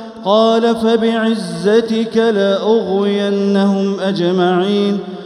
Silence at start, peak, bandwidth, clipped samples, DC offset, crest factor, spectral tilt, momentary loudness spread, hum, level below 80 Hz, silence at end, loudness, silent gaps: 0 s; 0 dBFS; 11 kHz; under 0.1%; under 0.1%; 14 dB; -6.5 dB/octave; 4 LU; none; -60 dBFS; 0 s; -14 LUFS; none